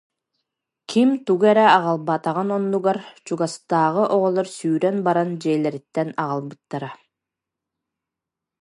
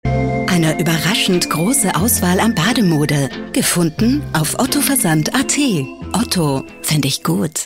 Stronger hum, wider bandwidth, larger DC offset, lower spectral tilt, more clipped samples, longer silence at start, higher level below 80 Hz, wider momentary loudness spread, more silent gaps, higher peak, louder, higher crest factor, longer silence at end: neither; second, 11.5 kHz vs 16.5 kHz; neither; first, -6 dB/octave vs -4 dB/octave; neither; first, 0.9 s vs 0.05 s; second, -76 dBFS vs -38 dBFS; first, 13 LU vs 5 LU; neither; about the same, 0 dBFS vs -2 dBFS; second, -20 LUFS vs -15 LUFS; first, 20 dB vs 12 dB; first, 1.7 s vs 0 s